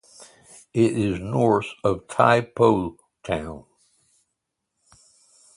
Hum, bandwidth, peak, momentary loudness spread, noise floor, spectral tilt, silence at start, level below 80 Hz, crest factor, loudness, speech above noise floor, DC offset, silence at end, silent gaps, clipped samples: none; 11.5 kHz; -2 dBFS; 15 LU; -80 dBFS; -6.5 dB/octave; 0.2 s; -50 dBFS; 22 dB; -22 LUFS; 58 dB; under 0.1%; 1.95 s; none; under 0.1%